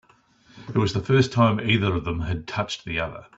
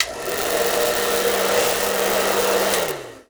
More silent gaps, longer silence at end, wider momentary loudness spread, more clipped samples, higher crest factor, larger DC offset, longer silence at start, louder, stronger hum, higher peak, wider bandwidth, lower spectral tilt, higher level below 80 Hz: neither; about the same, 0.15 s vs 0.1 s; first, 9 LU vs 4 LU; neither; about the same, 18 dB vs 20 dB; second, under 0.1% vs 0.2%; first, 0.55 s vs 0 s; second, -23 LUFS vs -19 LUFS; neither; second, -6 dBFS vs 0 dBFS; second, 8 kHz vs over 20 kHz; first, -6.5 dB/octave vs -1.5 dB/octave; about the same, -46 dBFS vs -50 dBFS